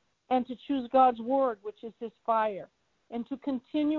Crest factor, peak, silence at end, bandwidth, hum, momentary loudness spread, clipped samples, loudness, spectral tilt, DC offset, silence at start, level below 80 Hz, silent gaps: 18 dB; -12 dBFS; 0 s; 4.5 kHz; none; 17 LU; under 0.1%; -29 LUFS; -7.5 dB/octave; under 0.1%; 0.3 s; -70 dBFS; none